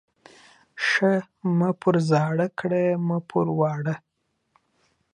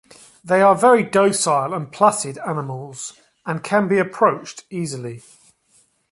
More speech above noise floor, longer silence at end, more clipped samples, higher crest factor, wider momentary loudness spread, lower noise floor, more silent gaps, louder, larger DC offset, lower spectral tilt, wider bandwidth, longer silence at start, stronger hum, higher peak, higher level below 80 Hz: first, 45 dB vs 41 dB; first, 1.15 s vs 0.9 s; neither; about the same, 18 dB vs 18 dB; second, 6 LU vs 17 LU; first, -68 dBFS vs -60 dBFS; neither; second, -23 LUFS vs -18 LUFS; neither; first, -7 dB/octave vs -4.5 dB/octave; second, 10 kHz vs 11.5 kHz; first, 0.75 s vs 0.45 s; neither; second, -6 dBFS vs -2 dBFS; about the same, -70 dBFS vs -66 dBFS